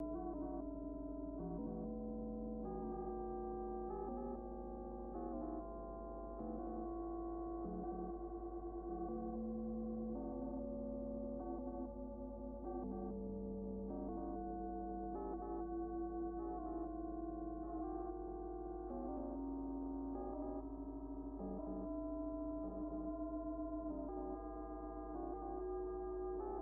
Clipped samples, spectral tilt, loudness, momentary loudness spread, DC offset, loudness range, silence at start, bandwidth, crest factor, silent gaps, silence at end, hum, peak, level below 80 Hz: under 0.1%; -8 dB/octave; -46 LUFS; 4 LU; under 0.1%; 1 LU; 0 s; 2 kHz; 10 dB; none; 0 s; none; -34 dBFS; -54 dBFS